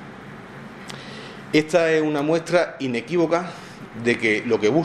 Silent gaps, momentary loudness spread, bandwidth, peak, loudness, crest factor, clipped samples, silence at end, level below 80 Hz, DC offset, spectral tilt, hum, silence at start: none; 19 LU; 12.5 kHz; -2 dBFS; -21 LUFS; 20 dB; under 0.1%; 0 s; -60 dBFS; under 0.1%; -5.5 dB/octave; none; 0 s